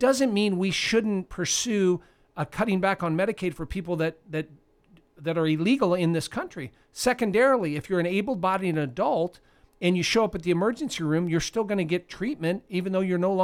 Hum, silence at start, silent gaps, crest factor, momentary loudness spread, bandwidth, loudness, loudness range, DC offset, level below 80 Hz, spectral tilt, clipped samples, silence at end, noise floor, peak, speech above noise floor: none; 0 s; none; 16 dB; 10 LU; 16 kHz; -26 LUFS; 3 LU; under 0.1%; -52 dBFS; -5 dB/octave; under 0.1%; 0 s; -59 dBFS; -10 dBFS; 34 dB